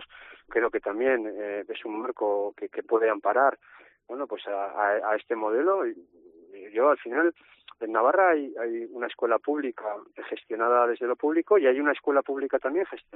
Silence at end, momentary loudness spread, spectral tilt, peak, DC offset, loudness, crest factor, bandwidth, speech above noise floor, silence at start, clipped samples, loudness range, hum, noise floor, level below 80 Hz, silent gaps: 0.15 s; 13 LU; -1.5 dB/octave; -8 dBFS; under 0.1%; -26 LUFS; 18 dB; 4 kHz; 23 dB; 0 s; under 0.1%; 3 LU; none; -49 dBFS; -72 dBFS; none